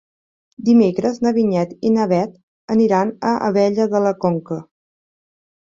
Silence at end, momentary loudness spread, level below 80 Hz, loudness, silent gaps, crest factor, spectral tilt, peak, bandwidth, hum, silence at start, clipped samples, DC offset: 1.15 s; 9 LU; -60 dBFS; -18 LUFS; 2.43-2.68 s; 16 dB; -7.5 dB/octave; -4 dBFS; 7.6 kHz; none; 0.6 s; under 0.1%; under 0.1%